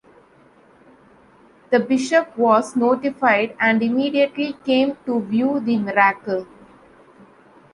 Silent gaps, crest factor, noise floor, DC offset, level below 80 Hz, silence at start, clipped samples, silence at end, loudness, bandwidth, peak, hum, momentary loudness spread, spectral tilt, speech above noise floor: none; 18 dB; -52 dBFS; under 0.1%; -64 dBFS; 1.7 s; under 0.1%; 1.3 s; -19 LUFS; 11 kHz; -2 dBFS; none; 5 LU; -5 dB/octave; 33 dB